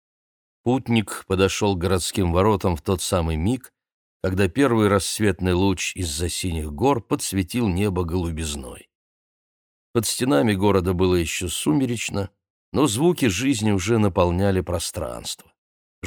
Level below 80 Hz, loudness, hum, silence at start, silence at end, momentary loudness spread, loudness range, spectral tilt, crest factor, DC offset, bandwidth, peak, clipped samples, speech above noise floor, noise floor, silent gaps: -40 dBFS; -22 LUFS; none; 0.65 s; 0 s; 10 LU; 3 LU; -5 dB/octave; 20 dB; under 0.1%; over 20 kHz; -4 dBFS; under 0.1%; over 69 dB; under -90 dBFS; 3.92-4.20 s, 8.95-9.94 s, 12.50-12.72 s, 15.58-16.02 s